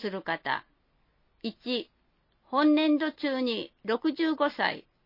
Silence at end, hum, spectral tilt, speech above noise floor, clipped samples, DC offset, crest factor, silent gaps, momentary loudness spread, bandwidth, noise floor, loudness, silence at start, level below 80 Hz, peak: 0.25 s; none; -6.5 dB/octave; 42 dB; under 0.1%; under 0.1%; 20 dB; none; 11 LU; 5.8 kHz; -70 dBFS; -29 LUFS; 0 s; -74 dBFS; -10 dBFS